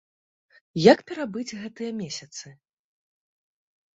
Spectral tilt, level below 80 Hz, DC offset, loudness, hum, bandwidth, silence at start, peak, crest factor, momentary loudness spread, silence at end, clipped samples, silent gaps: -5 dB/octave; -66 dBFS; under 0.1%; -24 LUFS; none; 8 kHz; 0.75 s; -2 dBFS; 26 dB; 18 LU; 1.45 s; under 0.1%; none